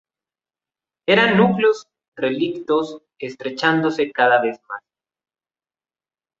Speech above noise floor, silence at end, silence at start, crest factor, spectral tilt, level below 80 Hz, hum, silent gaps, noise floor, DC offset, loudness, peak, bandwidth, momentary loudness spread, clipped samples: over 72 dB; 1.6 s; 1.1 s; 20 dB; -6 dB/octave; -64 dBFS; none; 2.08-2.12 s; under -90 dBFS; under 0.1%; -19 LUFS; -2 dBFS; 7.8 kHz; 18 LU; under 0.1%